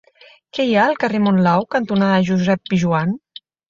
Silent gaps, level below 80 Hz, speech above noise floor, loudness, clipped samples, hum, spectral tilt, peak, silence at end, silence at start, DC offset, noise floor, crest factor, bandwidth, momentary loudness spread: none; -56 dBFS; 31 dB; -17 LUFS; under 0.1%; none; -7 dB/octave; -2 dBFS; 0.5 s; 0.55 s; under 0.1%; -48 dBFS; 16 dB; 7.4 kHz; 7 LU